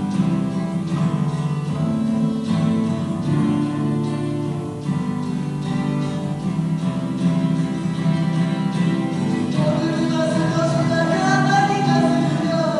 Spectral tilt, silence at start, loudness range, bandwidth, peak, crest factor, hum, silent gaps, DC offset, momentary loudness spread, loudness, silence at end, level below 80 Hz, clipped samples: -7 dB/octave; 0 s; 4 LU; 11.5 kHz; -4 dBFS; 14 dB; none; none; under 0.1%; 7 LU; -21 LUFS; 0 s; -52 dBFS; under 0.1%